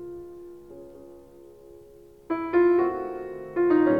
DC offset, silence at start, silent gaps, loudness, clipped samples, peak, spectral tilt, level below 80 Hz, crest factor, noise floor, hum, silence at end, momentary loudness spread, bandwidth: 0.1%; 0 s; none; -25 LUFS; under 0.1%; -12 dBFS; -8.5 dB/octave; -60 dBFS; 16 dB; -50 dBFS; none; 0 s; 24 LU; 4.8 kHz